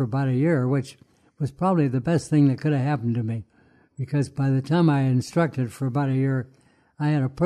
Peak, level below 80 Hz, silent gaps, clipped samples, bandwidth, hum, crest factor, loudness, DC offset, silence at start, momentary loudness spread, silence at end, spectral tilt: -8 dBFS; -58 dBFS; none; under 0.1%; 11 kHz; none; 14 dB; -23 LUFS; under 0.1%; 0 s; 10 LU; 0 s; -8 dB/octave